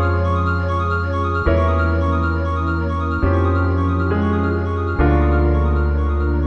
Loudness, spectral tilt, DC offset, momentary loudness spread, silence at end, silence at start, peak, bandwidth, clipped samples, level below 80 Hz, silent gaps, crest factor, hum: -18 LUFS; -9.5 dB/octave; under 0.1%; 4 LU; 0 s; 0 s; -2 dBFS; 5.8 kHz; under 0.1%; -22 dBFS; none; 14 dB; none